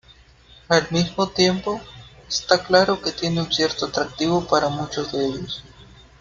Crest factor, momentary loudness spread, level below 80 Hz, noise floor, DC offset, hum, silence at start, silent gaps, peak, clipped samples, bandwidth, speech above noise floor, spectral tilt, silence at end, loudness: 22 dB; 11 LU; -50 dBFS; -50 dBFS; under 0.1%; none; 0.7 s; none; 0 dBFS; under 0.1%; 7.6 kHz; 29 dB; -4 dB/octave; 0.4 s; -21 LUFS